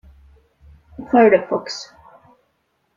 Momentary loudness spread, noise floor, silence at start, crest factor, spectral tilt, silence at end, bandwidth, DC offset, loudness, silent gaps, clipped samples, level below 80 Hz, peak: 25 LU; -68 dBFS; 1 s; 20 dB; -5 dB/octave; 1.15 s; 7.6 kHz; under 0.1%; -17 LUFS; none; under 0.1%; -54 dBFS; -2 dBFS